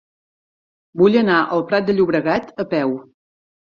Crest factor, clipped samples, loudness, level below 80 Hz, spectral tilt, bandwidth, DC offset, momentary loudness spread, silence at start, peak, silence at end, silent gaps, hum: 18 dB; under 0.1%; -18 LUFS; -58 dBFS; -8 dB/octave; 6.8 kHz; under 0.1%; 9 LU; 0.95 s; -2 dBFS; 0.75 s; none; none